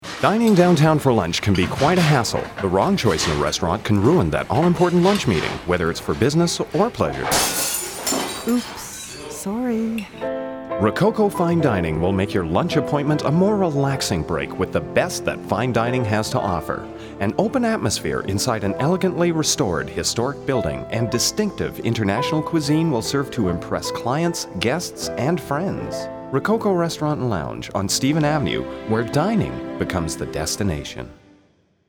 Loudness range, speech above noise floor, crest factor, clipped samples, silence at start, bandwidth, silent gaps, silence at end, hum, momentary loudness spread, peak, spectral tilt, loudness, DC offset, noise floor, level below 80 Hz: 4 LU; 39 dB; 20 dB; under 0.1%; 0 s; over 20 kHz; none; 0.75 s; none; 9 LU; -2 dBFS; -5 dB/octave; -21 LUFS; under 0.1%; -59 dBFS; -44 dBFS